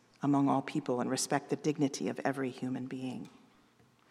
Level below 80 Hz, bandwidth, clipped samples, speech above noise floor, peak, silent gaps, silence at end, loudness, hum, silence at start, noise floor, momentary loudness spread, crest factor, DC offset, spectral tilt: -82 dBFS; 13.5 kHz; under 0.1%; 33 dB; -14 dBFS; none; 0.8 s; -34 LUFS; none; 0.2 s; -66 dBFS; 11 LU; 20 dB; under 0.1%; -5 dB/octave